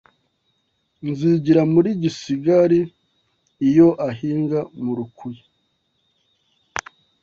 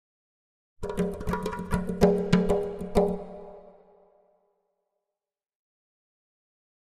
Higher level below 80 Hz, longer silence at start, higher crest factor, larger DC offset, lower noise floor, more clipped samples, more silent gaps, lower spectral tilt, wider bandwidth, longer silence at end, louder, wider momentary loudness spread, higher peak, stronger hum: second, -58 dBFS vs -44 dBFS; first, 1.05 s vs 0.8 s; second, 18 dB vs 24 dB; neither; second, -69 dBFS vs -90 dBFS; neither; neither; about the same, -7.5 dB/octave vs -7.5 dB/octave; second, 7.4 kHz vs 14.5 kHz; second, 0.4 s vs 3.2 s; first, -19 LUFS vs -27 LUFS; about the same, 16 LU vs 17 LU; first, -2 dBFS vs -6 dBFS; neither